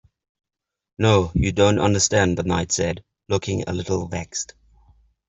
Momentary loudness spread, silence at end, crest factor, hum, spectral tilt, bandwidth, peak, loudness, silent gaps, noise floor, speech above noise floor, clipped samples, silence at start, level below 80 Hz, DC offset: 11 LU; 0.85 s; 20 dB; none; -4.5 dB/octave; 8.2 kHz; -4 dBFS; -21 LUFS; none; -56 dBFS; 36 dB; under 0.1%; 1 s; -42 dBFS; under 0.1%